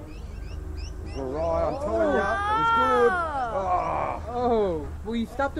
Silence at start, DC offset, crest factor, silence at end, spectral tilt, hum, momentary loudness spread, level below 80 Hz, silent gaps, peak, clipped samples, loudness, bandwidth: 0 s; under 0.1%; 18 dB; 0 s; -6.5 dB/octave; none; 16 LU; -38 dBFS; none; -8 dBFS; under 0.1%; -25 LUFS; 12.5 kHz